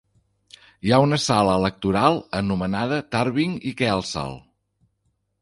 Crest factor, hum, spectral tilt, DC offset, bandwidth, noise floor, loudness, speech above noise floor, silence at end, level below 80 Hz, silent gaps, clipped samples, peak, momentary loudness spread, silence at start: 22 dB; none; -5.5 dB/octave; under 0.1%; 11.5 kHz; -71 dBFS; -22 LUFS; 50 dB; 1.05 s; -48 dBFS; none; under 0.1%; -2 dBFS; 10 LU; 0.85 s